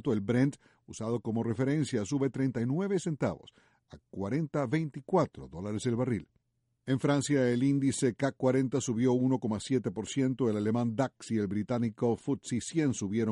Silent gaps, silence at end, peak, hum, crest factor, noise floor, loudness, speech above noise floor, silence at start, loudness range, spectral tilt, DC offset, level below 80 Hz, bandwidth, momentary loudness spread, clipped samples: none; 0 s; -16 dBFS; none; 16 dB; -78 dBFS; -31 LUFS; 47 dB; 0.05 s; 4 LU; -6.5 dB/octave; under 0.1%; -64 dBFS; 11.5 kHz; 7 LU; under 0.1%